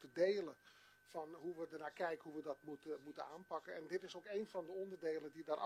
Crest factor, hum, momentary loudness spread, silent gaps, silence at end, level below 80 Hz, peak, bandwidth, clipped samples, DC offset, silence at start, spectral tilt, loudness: 20 dB; none; 10 LU; none; 0 s; under -90 dBFS; -26 dBFS; 14.5 kHz; under 0.1%; under 0.1%; 0 s; -5.5 dB/octave; -47 LUFS